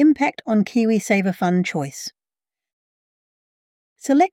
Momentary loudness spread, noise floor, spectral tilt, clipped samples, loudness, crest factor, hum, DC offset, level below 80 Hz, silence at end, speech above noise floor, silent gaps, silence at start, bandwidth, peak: 13 LU; under -90 dBFS; -6 dB/octave; under 0.1%; -20 LUFS; 16 dB; none; under 0.1%; -68 dBFS; 0.05 s; over 71 dB; 2.73-3.96 s; 0 s; 16 kHz; -6 dBFS